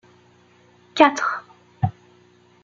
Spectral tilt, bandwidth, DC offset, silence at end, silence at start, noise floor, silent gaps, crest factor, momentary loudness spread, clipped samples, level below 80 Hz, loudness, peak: -5.5 dB/octave; 7.6 kHz; under 0.1%; 0.75 s; 0.95 s; -55 dBFS; none; 22 dB; 16 LU; under 0.1%; -60 dBFS; -21 LUFS; -2 dBFS